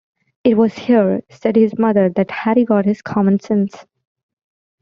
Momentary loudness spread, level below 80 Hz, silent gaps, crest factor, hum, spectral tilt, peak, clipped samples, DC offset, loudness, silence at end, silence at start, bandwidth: 5 LU; -58 dBFS; none; 14 dB; none; -8.5 dB/octave; -2 dBFS; under 0.1%; under 0.1%; -16 LUFS; 1 s; 0.45 s; 7 kHz